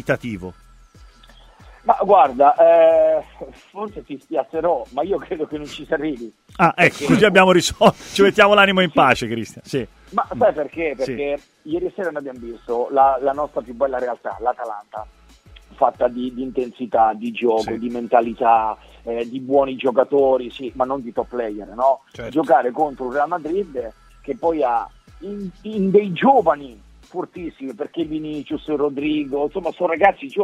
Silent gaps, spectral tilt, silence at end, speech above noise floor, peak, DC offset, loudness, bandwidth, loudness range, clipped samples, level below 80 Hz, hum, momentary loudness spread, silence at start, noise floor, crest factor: none; -5 dB/octave; 0 s; 28 dB; 0 dBFS; under 0.1%; -19 LUFS; 14.5 kHz; 9 LU; under 0.1%; -50 dBFS; none; 18 LU; 0.05 s; -47 dBFS; 20 dB